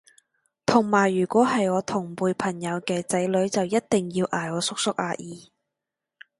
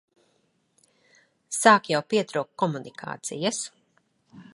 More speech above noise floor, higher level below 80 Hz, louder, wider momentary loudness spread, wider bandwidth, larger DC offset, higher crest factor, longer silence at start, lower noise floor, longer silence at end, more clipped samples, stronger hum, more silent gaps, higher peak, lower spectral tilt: first, 62 dB vs 45 dB; first, -64 dBFS vs -78 dBFS; about the same, -24 LUFS vs -24 LUFS; second, 9 LU vs 17 LU; about the same, 12 kHz vs 11.5 kHz; neither; about the same, 22 dB vs 26 dB; second, 0.7 s vs 1.5 s; first, -86 dBFS vs -69 dBFS; first, 1 s vs 0.15 s; neither; neither; neither; about the same, -2 dBFS vs -2 dBFS; first, -5 dB/octave vs -3.5 dB/octave